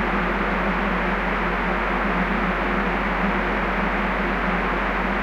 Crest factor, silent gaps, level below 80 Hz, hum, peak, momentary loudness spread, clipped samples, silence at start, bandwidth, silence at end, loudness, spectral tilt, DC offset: 14 dB; none; -32 dBFS; none; -8 dBFS; 1 LU; under 0.1%; 0 s; 8 kHz; 0 s; -22 LUFS; -7 dB/octave; under 0.1%